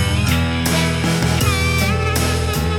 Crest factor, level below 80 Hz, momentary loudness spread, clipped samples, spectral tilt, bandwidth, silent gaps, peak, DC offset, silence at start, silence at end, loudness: 14 dB; -30 dBFS; 1 LU; under 0.1%; -4.5 dB/octave; 17.5 kHz; none; -4 dBFS; under 0.1%; 0 s; 0 s; -17 LUFS